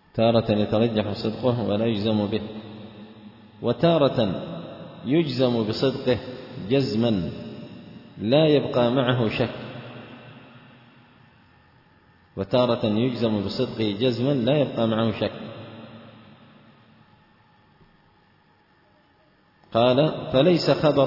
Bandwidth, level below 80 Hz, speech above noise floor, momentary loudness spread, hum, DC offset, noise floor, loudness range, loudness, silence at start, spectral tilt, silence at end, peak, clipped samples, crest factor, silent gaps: 5.8 kHz; -58 dBFS; 38 dB; 21 LU; none; under 0.1%; -60 dBFS; 7 LU; -23 LUFS; 0.15 s; -8 dB/octave; 0 s; -6 dBFS; under 0.1%; 18 dB; none